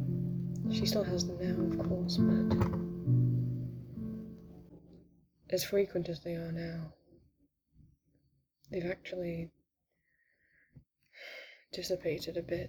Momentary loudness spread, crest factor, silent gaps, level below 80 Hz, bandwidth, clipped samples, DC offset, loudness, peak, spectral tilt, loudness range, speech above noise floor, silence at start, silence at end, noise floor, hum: 18 LU; 18 dB; none; -58 dBFS; over 20 kHz; under 0.1%; under 0.1%; -34 LUFS; -18 dBFS; -6.5 dB/octave; 12 LU; 48 dB; 0 s; 0 s; -81 dBFS; none